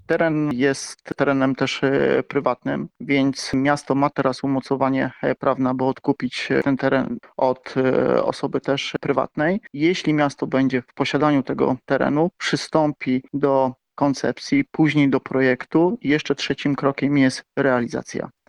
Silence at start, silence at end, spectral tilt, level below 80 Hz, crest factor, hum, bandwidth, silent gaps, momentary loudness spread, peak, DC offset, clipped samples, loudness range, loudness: 0.1 s; 0.2 s; -6 dB/octave; -56 dBFS; 18 dB; none; 11 kHz; none; 5 LU; -4 dBFS; under 0.1%; under 0.1%; 2 LU; -21 LUFS